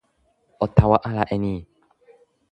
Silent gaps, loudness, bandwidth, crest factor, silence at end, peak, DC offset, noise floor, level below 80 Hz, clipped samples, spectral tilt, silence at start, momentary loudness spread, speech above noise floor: none; -21 LUFS; 5.8 kHz; 22 dB; 0.9 s; 0 dBFS; under 0.1%; -66 dBFS; -38 dBFS; under 0.1%; -10 dB/octave; 0.6 s; 11 LU; 46 dB